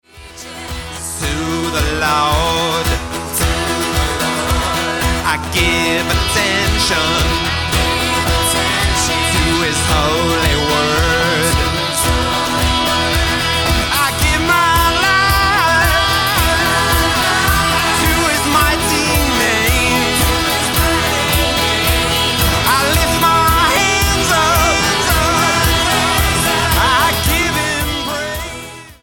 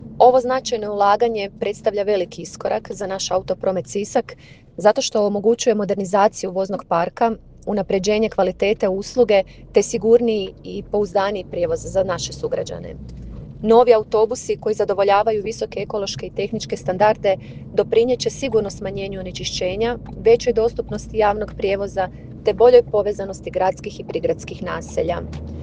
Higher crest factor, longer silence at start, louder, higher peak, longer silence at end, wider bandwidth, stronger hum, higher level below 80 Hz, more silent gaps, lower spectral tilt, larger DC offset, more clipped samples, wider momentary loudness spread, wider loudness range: second, 12 dB vs 20 dB; first, 0.15 s vs 0 s; first, -13 LUFS vs -20 LUFS; about the same, -2 dBFS vs 0 dBFS; about the same, 0.1 s vs 0 s; first, 17.5 kHz vs 9.6 kHz; neither; first, -24 dBFS vs -44 dBFS; neither; second, -3 dB/octave vs -4.5 dB/octave; neither; neither; second, 5 LU vs 12 LU; about the same, 4 LU vs 3 LU